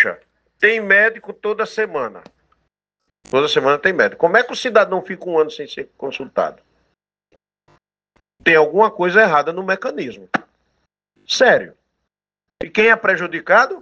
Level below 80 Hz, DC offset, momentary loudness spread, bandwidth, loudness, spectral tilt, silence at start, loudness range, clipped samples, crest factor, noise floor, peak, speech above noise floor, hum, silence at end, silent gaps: -62 dBFS; under 0.1%; 14 LU; 8.4 kHz; -16 LUFS; -4 dB/octave; 0 s; 4 LU; under 0.1%; 18 dB; -85 dBFS; 0 dBFS; 68 dB; none; 0 s; none